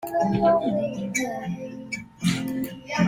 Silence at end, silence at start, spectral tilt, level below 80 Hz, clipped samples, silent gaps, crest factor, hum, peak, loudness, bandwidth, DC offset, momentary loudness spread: 0 s; 0 s; -5.5 dB/octave; -54 dBFS; under 0.1%; none; 18 dB; none; -8 dBFS; -26 LUFS; 16.5 kHz; under 0.1%; 13 LU